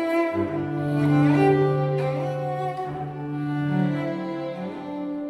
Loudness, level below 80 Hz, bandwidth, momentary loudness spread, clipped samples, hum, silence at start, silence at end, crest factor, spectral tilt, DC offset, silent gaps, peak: -24 LUFS; -58 dBFS; 11 kHz; 12 LU; under 0.1%; none; 0 s; 0 s; 16 dB; -9 dB/octave; under 0.1%; none; -8 dBFS